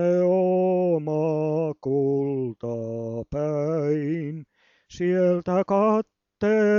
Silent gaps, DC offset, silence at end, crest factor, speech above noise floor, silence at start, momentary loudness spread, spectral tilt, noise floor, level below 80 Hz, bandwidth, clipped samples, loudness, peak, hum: none; under 0.1%; 0 s; 12 dB; 36 dB; 0 s; 10 LU; -9 dB/octave; -57 dBFS; -58 dBFS; 7.2 kHz; under 0.1%; -24 LUFS; -10 dBFS; none